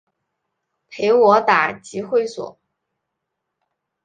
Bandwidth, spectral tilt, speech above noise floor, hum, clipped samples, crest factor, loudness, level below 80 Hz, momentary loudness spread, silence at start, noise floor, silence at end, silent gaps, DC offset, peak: 9.4 kHz; -4.5 dB/octave; 62 dB; none; under 0.1%; 20 dB; -17 LUFS; -66 dBFS; 18 LU; 0.9 s; -79 dBFS; 1.55 s; none; under 0.1%; -2 dBFS